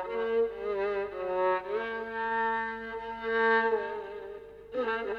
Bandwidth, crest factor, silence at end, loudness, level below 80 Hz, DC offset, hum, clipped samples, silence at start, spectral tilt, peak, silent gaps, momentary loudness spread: 5.8 kHz; 14 dB; 0 s; -31 LUFS; -62 dBFS; under 0.1%; 50 Hz at -60 dBFS; under 0.1%; 0 s; -6 dB/octave; -16 dBFS; none; 13 LU